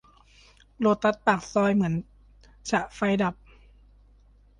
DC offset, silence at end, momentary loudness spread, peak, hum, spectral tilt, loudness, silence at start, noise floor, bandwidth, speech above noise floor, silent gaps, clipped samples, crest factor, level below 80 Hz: under 0.1%; 1.25 s; 6 LU; -6 dBFS; none; -6 dB/octave; -25 LUFS; 0.8 s; -57 dBFS; 10 kHz; 32 dB; none; under 0.1%; 20 dB; -54 dBFS